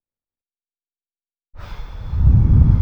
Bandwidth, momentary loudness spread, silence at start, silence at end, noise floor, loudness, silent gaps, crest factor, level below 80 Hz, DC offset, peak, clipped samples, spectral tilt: 3.8 kHz; 22 LU; 1.55 s; 0 s; under -90 dBFS; -15 LUFS; none; 16 dB; -20 dBFS; under 0.1%; 0 dBFS; under 0.1%; -10.5 dB/octave